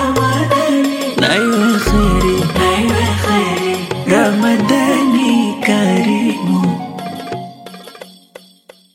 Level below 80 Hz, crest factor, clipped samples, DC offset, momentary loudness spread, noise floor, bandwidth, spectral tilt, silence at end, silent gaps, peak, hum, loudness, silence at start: -30 dBFS; 14 dB; under 0.1%; under 0.1%; 13 LU; -45 dBFS; 16.5 kHz; -5 dB/octave; 0.85 s; none; 0 dBFS; none; -14 LUFS; 0 s